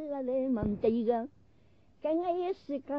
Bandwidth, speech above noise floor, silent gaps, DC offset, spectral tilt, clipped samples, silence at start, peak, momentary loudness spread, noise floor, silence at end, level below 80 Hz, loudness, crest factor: 5.8 kHz; 34 dB; none; under 0.1%; -7.5 dB/octave; under 0.1%; 0 s; -16 dBFS; 8 LU; -65 dBFS; 0 s; -56 dBFS; -32 LUFS; 16 dB